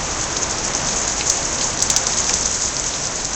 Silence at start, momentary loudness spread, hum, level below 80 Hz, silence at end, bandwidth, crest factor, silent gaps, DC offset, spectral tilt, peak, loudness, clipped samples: 0 s; 4 LU; none; -36 dBFS; 0 s; 17 kHz; 20 dB; none; under 0.1%; -1 dB/octave; 0 dBFS; -18 LUFS; under 0.1%